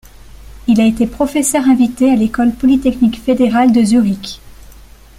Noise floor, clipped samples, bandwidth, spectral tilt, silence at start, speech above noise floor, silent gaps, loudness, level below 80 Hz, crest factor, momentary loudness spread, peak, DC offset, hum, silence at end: -38 dBFS; under 0.1%; 15 kHz; -5 dB/octave; 0.45 s; 26 dB; none; -13 LUFS; -38 dBFS; 12 dB; 7 LU; -2 dBFS; under 0.1%; none; 0.65 s